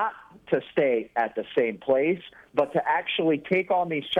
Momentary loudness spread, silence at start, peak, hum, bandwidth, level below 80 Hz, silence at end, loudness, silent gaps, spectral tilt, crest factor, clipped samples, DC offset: 5 LU; 0 s; -10 dBFS; none; 9.8 kHz; -68 dBFS; 0 s; -26 LUFS; none; -7 dB/octave; 16 dB; under 0.1%; under 0.1%